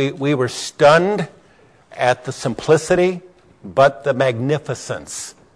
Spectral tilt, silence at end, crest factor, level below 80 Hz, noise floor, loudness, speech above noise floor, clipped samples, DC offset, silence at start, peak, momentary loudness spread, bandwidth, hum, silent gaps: -5 dB/octave; 0.25 s; 16 dB; -52 dBFS; -51 dBFS; -18 LUFS; 34 dB; under 0.1%; under 0.1%; 0 s; -2 dBFS; 14 LU; 11 kHz; none; none